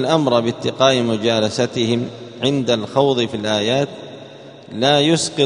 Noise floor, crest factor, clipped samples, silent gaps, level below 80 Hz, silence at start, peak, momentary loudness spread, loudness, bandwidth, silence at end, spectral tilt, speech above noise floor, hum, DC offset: -38 dBFS; 18 dB; under 0.1%; none; -58 dBFS; 0 s; 0 dBFS; 15 LU; -17 LUFS; 10.5 kHz; 0 s; -4.5 dB/octave; 21 dB; none; under 0.1%